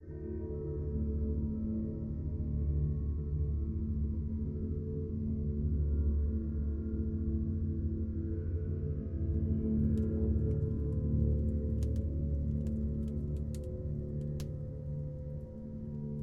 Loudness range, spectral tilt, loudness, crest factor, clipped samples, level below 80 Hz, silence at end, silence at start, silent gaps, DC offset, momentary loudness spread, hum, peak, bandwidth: 4 LU; -11 dB/octave; -36 LUFS; 16 dB; under 0.1%; -38 dBFS; 0 s; 0 s; none; under 0.1%; 8 LU; none; -18 dBFS; 1.9 kHz